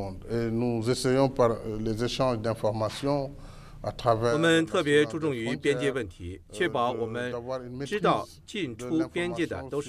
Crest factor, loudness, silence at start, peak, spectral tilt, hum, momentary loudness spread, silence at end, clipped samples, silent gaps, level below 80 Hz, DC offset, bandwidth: 20 dB; -28 LUFS; 0 s; -8 dBFS; -5.5 dB/octave; none; 12 LU; 0 s; under 0.1%; none; -50 dBFS; under 0.1%; 14.5 kHz